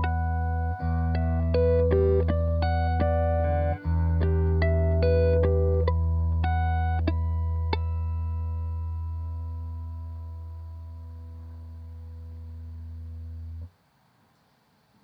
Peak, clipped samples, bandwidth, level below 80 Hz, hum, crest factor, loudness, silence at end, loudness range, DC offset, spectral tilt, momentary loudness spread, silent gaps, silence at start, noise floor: -10 dBFS; under 0.1%; 4.9 kHz; -32 dBFS; none; 16 dB; -26 LUFS; 1.35 s; 17 LU; under 0.1%; -10.5 dB/octave; 19 LU; none; 0 s; -65 dBFS